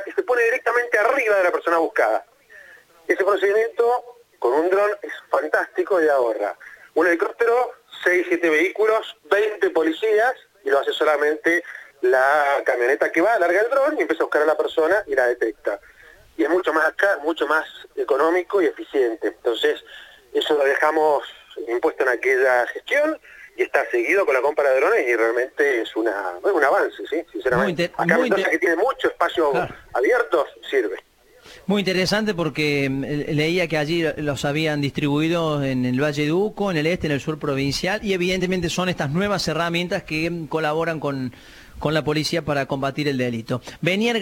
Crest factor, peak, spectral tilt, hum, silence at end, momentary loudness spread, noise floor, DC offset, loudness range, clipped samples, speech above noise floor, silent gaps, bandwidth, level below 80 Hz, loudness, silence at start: 18 dB; -2 dBFS; -5.5 dB/octave; none; 0 s; 7 LU; -48 dBFS; under 0.1%; 3 LU; under 0.1%; 27 dB; none; 17 kHz; -52 dBFS; -21 LUFS; 0 s